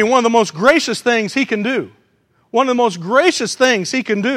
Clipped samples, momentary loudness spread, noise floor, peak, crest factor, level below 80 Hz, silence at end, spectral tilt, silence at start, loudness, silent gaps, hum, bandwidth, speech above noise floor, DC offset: under 0.1%; 6 LU; -59 dBFS; 0 dBFS; 16 dB; -60 dBFS; 0 s; -3.5 dB/octave; 0 s; -15 LUFS; none; none; 15 kHz; 44 dB; under 0.1%